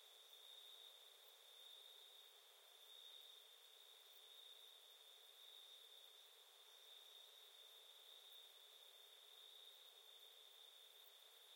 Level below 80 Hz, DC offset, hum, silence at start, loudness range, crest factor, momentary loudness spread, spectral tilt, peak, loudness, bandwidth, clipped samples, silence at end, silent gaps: under -90 dBFS; under 0.1%; none; 0 s; 1 LU; 16 dB; 4 LU; 3.5 dB/octave; -50 dBFS; -62 LUFS; 16.5 kHz; under 0.1%; 0 s; none